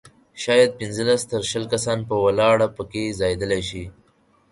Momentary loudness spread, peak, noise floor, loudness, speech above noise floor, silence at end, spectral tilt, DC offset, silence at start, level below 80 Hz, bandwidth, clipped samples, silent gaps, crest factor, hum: 11 LU; -4 dBFS; -60 dBFS; -21 LUFS; 39 dB; 0.6 s; -4.5 dB/octave; under 0.1%; 0.35 s; -48 dBFS; 11.5 kHz; under 0.1%; none; 18 dB; none